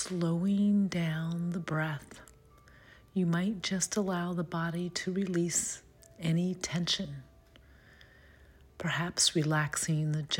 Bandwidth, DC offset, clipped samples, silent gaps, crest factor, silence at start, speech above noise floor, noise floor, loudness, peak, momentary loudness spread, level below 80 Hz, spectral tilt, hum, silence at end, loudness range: 16.5 kHz; under 0.1%; under 0.1%; none; 18 dB; 0 s; 27 dB; -58 dBFS; -31 LUFS; -14 dBFS; 10 LU; -62 dBFS; -4 dB/octave; none; 0 s; 2 LU